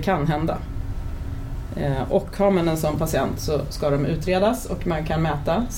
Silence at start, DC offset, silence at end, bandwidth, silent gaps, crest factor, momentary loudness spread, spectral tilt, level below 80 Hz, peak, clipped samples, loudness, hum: 0 s; under 0.1%; 0 s; 17 kHz; none; 16 dB; 11 LU; -6.5 dB/octave; -32 dBFS; -8 dBFS; under 0.1%; -24 LUFS; none